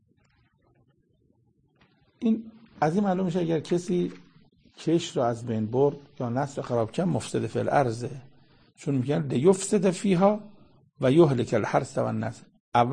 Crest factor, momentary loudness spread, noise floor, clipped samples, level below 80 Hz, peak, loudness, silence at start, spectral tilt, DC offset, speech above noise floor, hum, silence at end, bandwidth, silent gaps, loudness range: 20 dB; 10 LU; -66 dBFS; under 0.1%; -62 dBFS; -6 dBFS; -26 LUFS; 2.2 s; -6.5 dB/octave; under 0.1%; 41 dB; none; 0 s; 9.8 kHz; 12.60-12.72 s; 5 LU